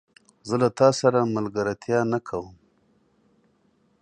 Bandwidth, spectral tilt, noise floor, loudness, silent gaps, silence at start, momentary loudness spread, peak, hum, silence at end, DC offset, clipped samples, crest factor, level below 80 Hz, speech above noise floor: 10 kHz; -6 dB/octave; -65 dBFS; -23 LUFS; none; 0.45 s; 15 LU; -4 dBFS; none; 1.5 s; under 0.1%; under 0.1%; 22 dB; -62 dBFS; 42 dB